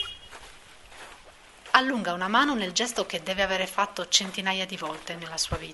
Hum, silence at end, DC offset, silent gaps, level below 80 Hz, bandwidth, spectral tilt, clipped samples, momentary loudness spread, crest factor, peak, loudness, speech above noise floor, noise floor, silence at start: none; 0 s; under 0.1%; none; -52 dBFS; 11.5 kHz; -2 dB/octave; under 0.1%; 22 LU; 28 dB; -2 dBFS; -26 LUFS; 23 dB; -51 dBFS; 0 s